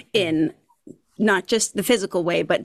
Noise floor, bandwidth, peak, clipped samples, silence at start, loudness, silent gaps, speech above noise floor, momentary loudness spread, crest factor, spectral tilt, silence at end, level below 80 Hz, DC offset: -48 dBFS; 14.5 kHz; -8 dBFS; under 0.1%; 0.15 s; -21 LUFS; none; 27 dB; 4 LU; 14 dB; -3.5 dB/octave; 0 s; -60 dBFS; under 0.1%